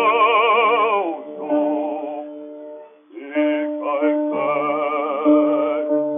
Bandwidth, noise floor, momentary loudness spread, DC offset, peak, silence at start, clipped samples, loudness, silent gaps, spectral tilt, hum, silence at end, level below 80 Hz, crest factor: 3.7 kHz; -39 dBFS; 18 LU; under 0.1%; -6 dBFS; 0 s; under 0.1%; -19 LUFS; none; -1.5 dB/octave; none; 0 s; under -90 dBFS; 14 dB